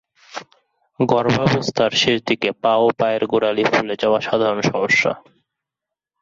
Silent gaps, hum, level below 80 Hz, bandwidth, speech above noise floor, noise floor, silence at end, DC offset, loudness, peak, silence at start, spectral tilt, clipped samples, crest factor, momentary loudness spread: none; none; -56 dBFS; 7.8 kHz; 67 dB; -85 dBFS; 1 s; under 0.1%; -18 LUFS; -4 dBFS; 0.35 s; -5 dB/octave; under 0.1%; 16 dB; 9 LU